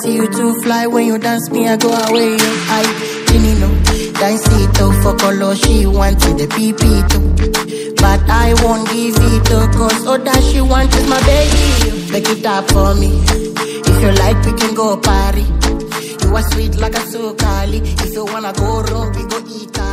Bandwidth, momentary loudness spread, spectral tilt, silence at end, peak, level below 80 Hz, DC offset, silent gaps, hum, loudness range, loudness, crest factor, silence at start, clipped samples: 16.5 kHz; 7 LU; -5 dB/octave; 0 s; 0 dBFS; -16 dBFS; under 0.1%; none; none; 5 LU; -13 LUFS; 12 dB; 0 s; under 0.1%